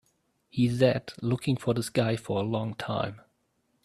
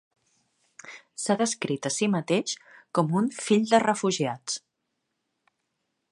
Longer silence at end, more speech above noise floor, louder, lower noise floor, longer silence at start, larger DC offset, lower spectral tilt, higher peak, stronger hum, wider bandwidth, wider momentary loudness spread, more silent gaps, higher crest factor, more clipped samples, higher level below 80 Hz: second, 0.65 s vs 1.55 s; second, 46 dB vs 54 dB; second, -29 LUFS vs -26 LUFS; second, -73 dBFS vs -80 dBFS; second, 0.55 s vs 0.85 s; neither; first, -6.5 dB/octave vs -4.5 dB/octave; about the same, -8 dBFS vs -8 dBFS; neither; first, 13.5 kHz vs 11.5 kHz; second, 8 LU vs 15 LU; neither; about the same, 20 dB vs 20 dB; neither; first, -60 dBFS vs -76 dBFS